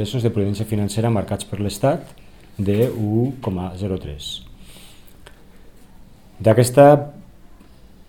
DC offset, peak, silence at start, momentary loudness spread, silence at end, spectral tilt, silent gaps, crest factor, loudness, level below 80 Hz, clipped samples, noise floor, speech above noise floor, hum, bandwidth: 0.4%; 0 dBFS; 0 s; 17 LU; 0.85 s; -6.5 dB/octave; none; 20 dB; -19 LUFS; -46 dBFS; under 0.1%; -46 dBFS; 28 dB; none; 18 kHz